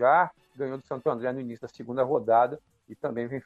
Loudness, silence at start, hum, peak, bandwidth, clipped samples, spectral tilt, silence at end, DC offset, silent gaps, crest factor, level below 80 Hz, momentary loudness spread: -28 LUFS; 0 s; none; -10 dBFS; 7.6 kHz; under 0.1%; -8 dB/octave; 0.05 s; under 0.1%; none; 18 dB; -70 dBFS; 14 LU